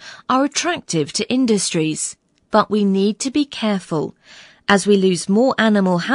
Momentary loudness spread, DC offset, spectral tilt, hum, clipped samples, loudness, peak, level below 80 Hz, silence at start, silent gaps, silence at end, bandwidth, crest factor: 8 LU; under 0.1%; -4.5 dB/octave; none; under 0.1%; -18 LUFS; 0 dBFS; -60 dBFS; 0 s; none; 0 s; 11 kHz; 18 dB